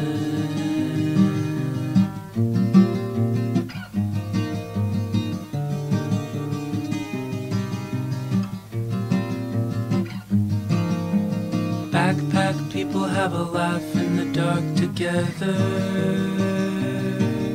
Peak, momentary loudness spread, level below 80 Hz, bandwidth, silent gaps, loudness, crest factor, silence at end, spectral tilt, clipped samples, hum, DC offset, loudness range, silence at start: -4 dBFS; 6 LU; -54 dBFS; 16 kHz; none; -24 LUFS; 18 dB; 0 s; -7 dB/octave; under 0.1%; none; under 0.1%; 5 LU; 0 s